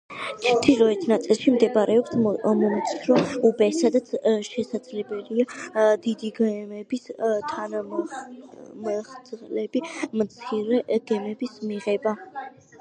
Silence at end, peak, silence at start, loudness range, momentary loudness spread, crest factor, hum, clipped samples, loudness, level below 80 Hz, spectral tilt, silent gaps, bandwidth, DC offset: 0.3 s; -2 dBFS; 0.1 s; 9 LU; 14 LU; 22 dB; none; under 0.1%; -24 LUFS; -66 dBFS; -5.5 dB/octave; none; 10 kHz; under 0.1%